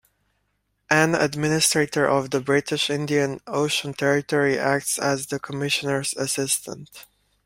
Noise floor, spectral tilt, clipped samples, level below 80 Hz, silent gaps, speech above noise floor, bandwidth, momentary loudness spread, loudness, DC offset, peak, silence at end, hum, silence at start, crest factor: -72 dBFS; -3.5 dB/octave; under 0.1%; -60 dBFS; none; 49 dB; 16 kHz; 6 LU; -22 LUFS; under 0.1%; -2 dBFS; 0.45 s; none; 0.9 s; 22 dB